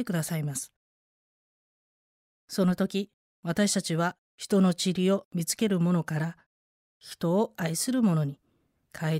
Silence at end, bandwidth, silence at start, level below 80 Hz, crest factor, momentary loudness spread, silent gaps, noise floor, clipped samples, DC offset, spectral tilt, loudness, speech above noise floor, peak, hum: 0 s; 16 kHz; 0 s; -66 dBFS; 14 dB; 11 LU; 0.76-2.48 s, 3.14-3.43 s, 4.18-4.38 s, 5.25-5.31 s, 6.46-7.00 s; -71 dBFS; under 0.1%; under 0.1%; -5.5 dB/octave; -28 LUFS; 44 dB; -14 dBFS; none